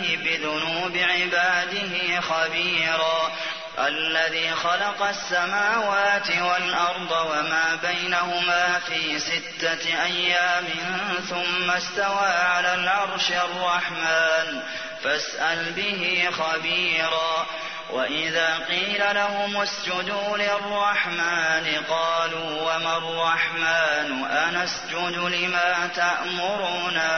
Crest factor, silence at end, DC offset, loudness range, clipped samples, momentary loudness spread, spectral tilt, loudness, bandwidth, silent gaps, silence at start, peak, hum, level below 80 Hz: 16 dB; 0 s; 0.2%; 1 LU; under 0.1%; 5 LU; -2 dB/octave; -23 LUFS; 6.6 kHz; none; 0 s; -8 dBFS; none; -64 dBFS